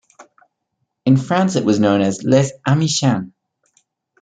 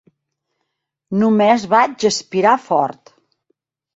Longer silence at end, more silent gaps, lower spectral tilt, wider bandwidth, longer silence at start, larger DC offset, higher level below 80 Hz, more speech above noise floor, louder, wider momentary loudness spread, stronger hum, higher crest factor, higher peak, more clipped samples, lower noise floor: about the same, 0.95 s vs 1.05 s; neither; about the same, -5.5 dB/octave vs -4.5 dB/octave; first, 9.4 kHz vs 8 kHz; second, 0.2 s vs 1.1 s; neither; about the same, -58 dBFS vs -62 dBFS; about the same, 58 dB vs 60 dB; about the same, -17 LUFS vs -16 LUFS; about the same, 6 LU vs 6 LU; neither; about the same, 16 dB vs 16 dB; about the same, -2 dBFS vs -2 dBFS; neither; about the same, -73 dBFS vs -75 dBFS